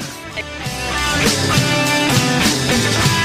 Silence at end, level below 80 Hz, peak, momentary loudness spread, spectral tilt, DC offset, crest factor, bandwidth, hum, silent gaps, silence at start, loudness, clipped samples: 0 s; -34 dBFS; -4 dBFS; 11 LU; -3.5 dB/octave; under 0.1%; 14 dB; 16 kHz; none; none; 0 s; -15 LUFS; under 0.1%